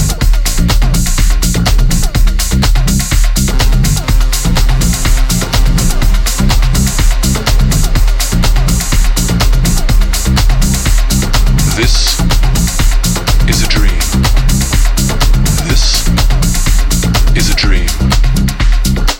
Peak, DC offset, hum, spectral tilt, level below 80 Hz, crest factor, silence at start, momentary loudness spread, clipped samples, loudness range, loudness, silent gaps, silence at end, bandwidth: 0 dBFS; under 0.1%; none; -4 dB/octave; -10 dBFS; 8 dB; 0 s; 2 LU; under 0.1%; 1 LU; -12 LUFS; none; 0 s; 17 kHz